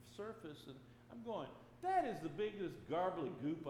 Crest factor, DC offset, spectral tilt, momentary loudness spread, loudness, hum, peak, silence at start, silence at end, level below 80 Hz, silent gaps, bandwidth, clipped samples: 18 dB; under 0.1%; -6.5 dB/octave; 17 LU; -43 LUFS; none; -26 dBFS; 0 s; 0 s; -72 dBFS; none; 15.5 kHz; under 0.1%